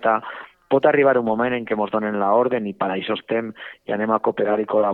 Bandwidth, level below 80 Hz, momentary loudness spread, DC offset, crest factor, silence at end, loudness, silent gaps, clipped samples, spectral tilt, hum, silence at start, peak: 4.2 kHz; -64 dBFS; 10 LU; under 0.1%; 18 dB; 0 s; -21 LUFS; none; under 0.1%; -8.5 dB/octave; none; 0 s; -2 dBFS